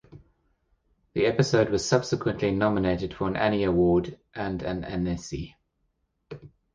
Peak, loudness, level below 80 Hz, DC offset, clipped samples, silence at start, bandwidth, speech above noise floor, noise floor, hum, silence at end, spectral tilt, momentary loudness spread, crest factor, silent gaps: -6 dBFS; -26 LUFS; -48 dBFS; under 0.1%; under 0.1%; 0.1 s; 9.8 kHz; 49 dB; -74 dBFS; none; 0.3 s; -6 dB/octave; 15 LU; 20 dB; none